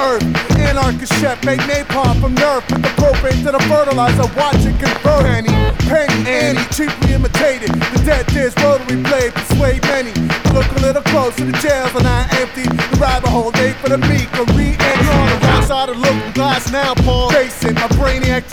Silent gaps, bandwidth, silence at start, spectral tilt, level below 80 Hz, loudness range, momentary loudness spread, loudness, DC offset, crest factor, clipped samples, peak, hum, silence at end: none; over 20 kHz; 0 s; -5.5 dB/octave; -22 dBFS; 1 LU; 4 LU; -14 LUFS; 1%; 12 dB; under 0.1%; -2 dBFS; none; 0 s